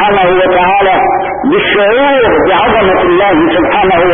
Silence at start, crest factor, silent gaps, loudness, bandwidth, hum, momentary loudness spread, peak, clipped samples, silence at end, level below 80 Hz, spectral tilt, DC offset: 0 s; 8 dB; none; -8 LUFS; 3.7 kHz; none; 2 LU; 0 dBFS; under 0.1%; 0 s; -34 dBFS; -9.5 dB/octave; under 0.1%